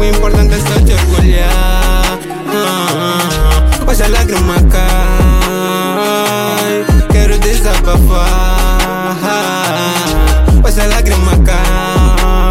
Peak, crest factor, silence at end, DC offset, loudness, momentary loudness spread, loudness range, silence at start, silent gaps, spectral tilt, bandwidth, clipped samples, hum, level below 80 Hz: 0 dBFS; 8 dB; 0 s; under 0.1%; -11 LUFS; 4 LU; 1 LU; 0 s; none; -5 dB/octave; 16.5 kHz; under 0.1%; none; -10 dBFS